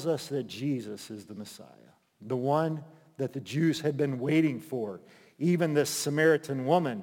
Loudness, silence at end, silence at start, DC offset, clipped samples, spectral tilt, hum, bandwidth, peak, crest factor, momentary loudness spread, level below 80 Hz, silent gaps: -29 LUFS; 0 s; 0 s; under 0.1%; under 0.1%; -5.5 dB/octave; none; 17 kHz; -12 dBFS; 18 dB; 17 LU; -80 dBFS; none